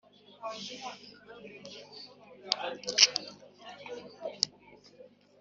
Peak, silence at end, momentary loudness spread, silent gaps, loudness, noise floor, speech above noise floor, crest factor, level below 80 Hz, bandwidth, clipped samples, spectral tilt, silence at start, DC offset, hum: -2 dBFS; 0.35 s; 27 LU; none; -29 LUFS; -57 dBFS; 23 dB; 34 dB; -80 dBFS; 8 kHz; under 0.1%; 1.5 dB/octave; 0.3 s; under 0.1%; 50 Hz at -70 dBFS